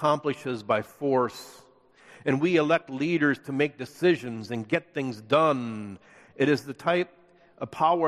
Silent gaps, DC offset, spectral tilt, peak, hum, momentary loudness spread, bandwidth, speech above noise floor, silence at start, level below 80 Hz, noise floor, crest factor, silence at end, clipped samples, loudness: none; under 0.1%; -6.5 dB/octave; -8 dBFS; none; 13 LU; 14 kHz; 30 dB; 0 s; -70 dBFS; -56 dBFS; 18 dB; 0 s; under 0.1%; -27 LUFS